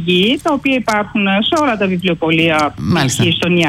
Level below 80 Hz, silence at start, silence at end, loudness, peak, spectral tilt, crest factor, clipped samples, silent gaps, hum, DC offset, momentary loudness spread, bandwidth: -44 dBFS; 0 s; 0 s; -14 LUFS; -4 dBFS; -5 dB/octave; 10 dB; under 0.1%; none; none; under 0.1%; 3 LU; 16 kHz